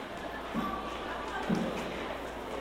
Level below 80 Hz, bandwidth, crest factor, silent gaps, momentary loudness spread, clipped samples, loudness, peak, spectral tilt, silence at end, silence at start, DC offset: -52 dBFS; 16 kHz; 18 dB; none; 7 LU; under 0.1%; -36 LUFS; -16 dBFS; -5.5 dB/octave; 0 s; 0 s; under 0.1%